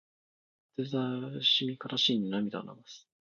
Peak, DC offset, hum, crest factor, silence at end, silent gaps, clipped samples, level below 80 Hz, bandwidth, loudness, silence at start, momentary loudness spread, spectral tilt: -16 dBFS; under 0.1%; none; 18 dB; 0.3 s; none; under 0.1%; -78 dBFS; 7.4 kHz; -30 LUFS; 0.8 s; 17 LU; -5 dB/octave